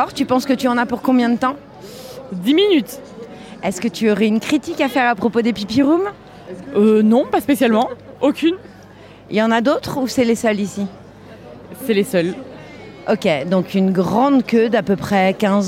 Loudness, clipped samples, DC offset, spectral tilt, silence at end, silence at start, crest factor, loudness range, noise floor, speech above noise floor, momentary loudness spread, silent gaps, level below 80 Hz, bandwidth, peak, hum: -17 LUFS; under 0.1%; under 0.1%; -5.5 dB/octave; 0 s; 0 s; 14 dB; 4 LU; -41 dBFS; 24 dB; 19 LU; none; -54 dBFS; 16 kHz; -4 dBFS; none